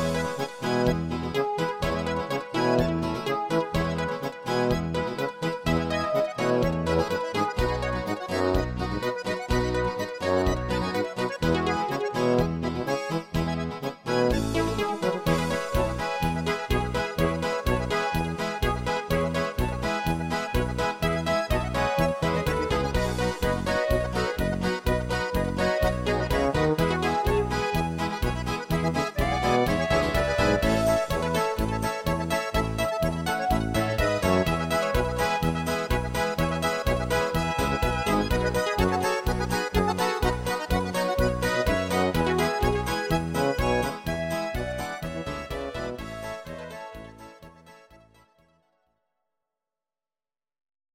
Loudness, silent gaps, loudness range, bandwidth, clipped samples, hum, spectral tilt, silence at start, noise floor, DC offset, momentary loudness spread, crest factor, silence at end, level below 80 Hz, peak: -26 LUFS; none; 2 LU; 16.5 kHz; under 0.1%; none; -5.5 dB/octave; 0 s; under -90 dBFS; under 0.1%; 5 LU; 18 dB; 2.95 s; -36 dBFS; -8 dBFS